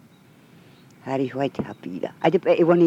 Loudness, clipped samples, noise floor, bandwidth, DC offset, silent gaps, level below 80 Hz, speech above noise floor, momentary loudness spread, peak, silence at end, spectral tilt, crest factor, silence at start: -24 LUFS; under 0.1%; -52 dBFS; 7.8 kHz; under 0.1%; none; -66 dBFS; 31 dB; 14 LU; -4 dBFS; 0 s; -8 dB/octave; 18 dB; 1.05 s